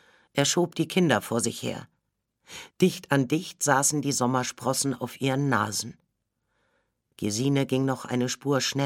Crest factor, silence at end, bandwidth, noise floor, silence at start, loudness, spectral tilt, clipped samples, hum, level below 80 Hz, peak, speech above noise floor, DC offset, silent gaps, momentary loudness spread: 22 dB; 0 s; 17 kHz; -78 dBFS; 0.35 s; -26 LUFS; -4 dB/octave; under 0.1%; none; -68 dBFS; -6 dBFS; 52 dB; under 0.1%; none; 10 LU